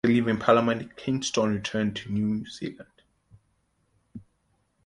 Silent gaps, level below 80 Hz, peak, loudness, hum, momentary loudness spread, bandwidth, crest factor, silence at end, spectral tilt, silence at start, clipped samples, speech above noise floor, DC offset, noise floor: none; -58 dBFS; -6 dBFS; -26 LUFS; none; 12 LU; 11 kHz; 22 dB; 0.65 s; -5.5 dB/octave; 0.05 s; under 0.1%; 45 dB; under 0.1%; -71 dBFS